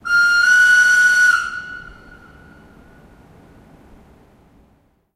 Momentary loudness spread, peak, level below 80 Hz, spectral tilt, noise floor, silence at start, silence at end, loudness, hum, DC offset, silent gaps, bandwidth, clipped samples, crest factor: 21 LU; -4 dBFS; -52 dBFS; 1 dB/octave; -58 dBFS; 0.05 s; 3.25 s; -12 LUFS; none; under 0.1%; none; 15.5 kHz; under 0.1%; 14 dB